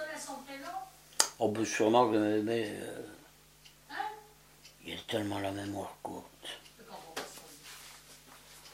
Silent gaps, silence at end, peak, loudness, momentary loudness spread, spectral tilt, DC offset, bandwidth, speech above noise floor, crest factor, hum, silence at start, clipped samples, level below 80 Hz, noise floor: none; 0 s; -4 dBFS; -34 LUFS; 22 LU; -3.5 dB/octave; under 0.1%; 16 kHz; 27 dB; 32 dB; none; 0 s; under 0.1%; -70 dBFS; -59 dBFS